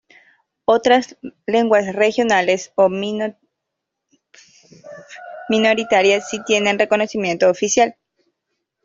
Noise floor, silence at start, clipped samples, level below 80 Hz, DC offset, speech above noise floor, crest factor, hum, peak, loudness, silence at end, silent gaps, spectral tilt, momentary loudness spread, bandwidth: -79 dBFS; 0.7 s; under 0.1%; -62 dBFS; under 0.1%; 63 dB; 16 dB; none; -2 dBFS; -17 LUFS; 0.95 s; none; -3.5 dB/octave; 13 LU; 7.8 kHz